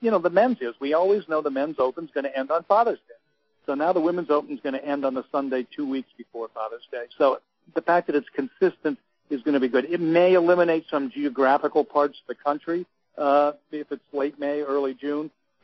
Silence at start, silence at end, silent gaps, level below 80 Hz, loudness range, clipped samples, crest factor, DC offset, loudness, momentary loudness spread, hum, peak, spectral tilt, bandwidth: 0 s; 0.35 s; none; -74 dBFS; 5 LU; under 0.1%; 18 dB; under 0.1%; -24 LUFS; 13 LU; none; -6 dBFS; -4 dB/octave; 6 kHz